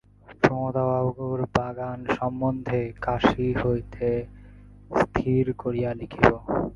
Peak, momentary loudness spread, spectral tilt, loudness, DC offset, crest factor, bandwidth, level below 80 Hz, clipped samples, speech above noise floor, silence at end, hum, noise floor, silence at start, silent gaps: -2 dBFS; 8 LU; -8 dB/octave; -25 LUFS; under 0.1%; 24 dB; 7.4 kHz; -44 dBFS; under 0.1%; 22 dB; 0 s; 50 Hz at -40 dBFS; -47 dBFS; 0.3 s; none